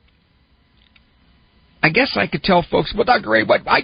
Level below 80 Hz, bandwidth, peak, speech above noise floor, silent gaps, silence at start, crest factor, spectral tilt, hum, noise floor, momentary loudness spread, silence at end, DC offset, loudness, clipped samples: -44 dBFS; 5.4 kHz; -2 dBFS; 41 dB; none; 1.85 s; 18 dB; -2.5 dB/octave; none; -57 dBFS; 4 LU; 0 s; under 0.1%; -17 LUFS; under 0.1%